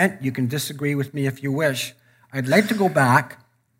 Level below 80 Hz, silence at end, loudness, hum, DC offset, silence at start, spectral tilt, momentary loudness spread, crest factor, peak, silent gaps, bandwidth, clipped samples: -68 dBFS; 0.45 s; -21 LUFS; none; under 0.1%; 0 s; -5.5 dB/octave; 11 LU; 20 dB; -2 dBFS; none; 16 kHz; under 0.1%